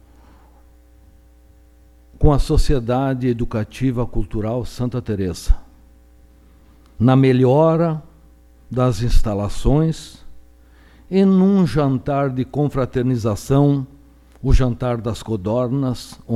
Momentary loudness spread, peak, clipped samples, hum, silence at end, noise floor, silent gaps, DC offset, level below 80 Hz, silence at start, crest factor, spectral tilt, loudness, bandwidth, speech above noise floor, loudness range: 11 LU; 0 dBFS; under 0.1%; none; 0 s; -49 dBFS; none; under 0.1%; -26 dBFS; 2.2 s; 18 dB; -8 dB/octave; -19 LUFS; 13 kHz; 32 dB; 5 LU